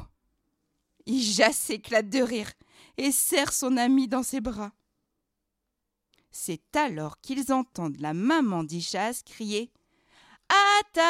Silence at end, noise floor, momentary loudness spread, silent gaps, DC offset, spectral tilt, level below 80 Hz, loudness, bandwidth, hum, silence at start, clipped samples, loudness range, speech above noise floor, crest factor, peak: 0 s; -82 dBFS; 15 LU; none; under 0.1%; -3 dB/octave; -60 dBFS; -26 LUFS; 16 kHz; none; 0 s; under 0.1%; 8 LU; 56 dB; 22 dB; -6 dBFS